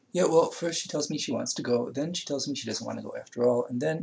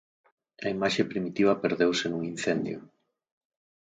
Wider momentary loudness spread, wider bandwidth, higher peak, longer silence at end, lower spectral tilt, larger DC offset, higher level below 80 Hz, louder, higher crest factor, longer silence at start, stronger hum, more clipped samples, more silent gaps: about the same, 9 LU vs 10 LU; second, 8 kHz vs 9.4 kHz; about the same, -8 dBFS vs -10 dBFS; second, 0 s vs 1.05 s; about the same, -4 dB/octave vs -5 dB/octave; neither; second, -76 dBFS vs -66 dBFS; about the same, -29 LUFS vs -28 LUFS; about the same, 20 dB vs 20 dB; second, 0.15 s vs 0.6 s; neither; neither; neither